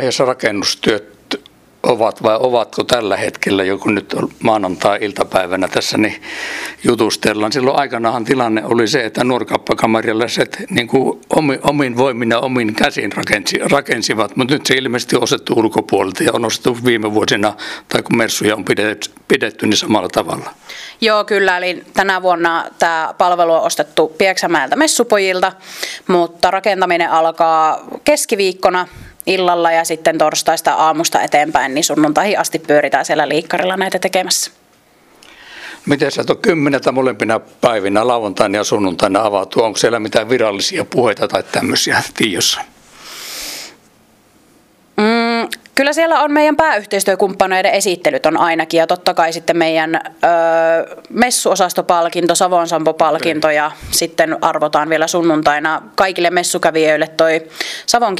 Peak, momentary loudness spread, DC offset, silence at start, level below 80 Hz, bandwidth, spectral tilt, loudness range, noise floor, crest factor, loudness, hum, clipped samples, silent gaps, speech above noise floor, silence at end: 0 dBFS; 5 LU; under 0.1%; 0 s; -52 dBFS; 16 kHz; -3.5 dB/octave; 3 LU; -50 dBFS; 14 dB; -14 LUFS; none; under 0.1%; none; 36 dB; 0 s